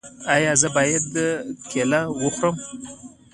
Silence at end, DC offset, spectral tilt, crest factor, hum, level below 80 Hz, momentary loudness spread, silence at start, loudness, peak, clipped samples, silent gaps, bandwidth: 0.25 s; under 0.1%; -3.5 dB/octave; 22 dB; none; -58 dBFS; 15 LU; 0.05 s; -21 LUFS; -2 dBFS; under 0.1%; none; 11.5 kHz